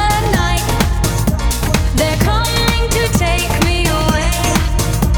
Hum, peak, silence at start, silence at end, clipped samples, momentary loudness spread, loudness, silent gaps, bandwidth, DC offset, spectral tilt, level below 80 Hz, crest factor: none; 0 dBFS; 0 s; 0 s; under 0.1%; 2 LU; -15 LUFS; none; over 20 kHz; 0.3%; -4.5 dB/octave; -18 dBFS; 14 dB